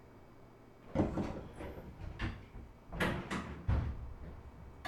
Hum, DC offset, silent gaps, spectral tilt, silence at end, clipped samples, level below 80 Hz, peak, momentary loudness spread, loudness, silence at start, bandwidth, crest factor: none; under 0.1%; none; -6.5 dB/octave; 0 s; under 0.1%; -46 dBFS; -20 dBFS; 22 LU; -40 LUFS; 0 s; 17 kHz; 22 dB